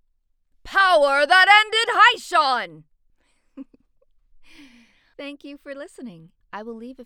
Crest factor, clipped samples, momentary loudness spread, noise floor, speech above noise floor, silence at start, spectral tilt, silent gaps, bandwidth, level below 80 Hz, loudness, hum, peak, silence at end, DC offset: 20 dB; under 0.1%; 25 LU; -67 dBFS; 47 dB; 0.65 s; -1 dB/octave; none; 17.5 kHz; -60 dBFS; -16 LUFS; none; -2 dBFS; 0.05 s; under 0.1%